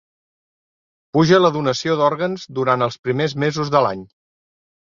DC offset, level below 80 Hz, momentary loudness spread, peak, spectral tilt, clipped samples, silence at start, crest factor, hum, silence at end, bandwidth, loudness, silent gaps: under 0.1%; -58 dBFS; 9 LU; -2 dBFS; -6 dB/octave; under 0.1%; 1.15 s; 18 dB; none; 0.85 s; 7.4 kHz; -18 LUFS; 2.99-3.03 s